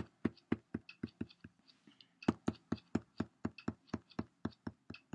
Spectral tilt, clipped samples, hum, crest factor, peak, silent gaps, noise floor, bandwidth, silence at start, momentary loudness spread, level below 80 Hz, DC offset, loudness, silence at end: -7 dB/octave; under 0.1%; none; 28 dB; -16 dBFS; none; -68 dBFS; 10 kHz; 0 s; 14 LU; -70 dBFS; under 0.1%; -44 LUFS; 0.15 s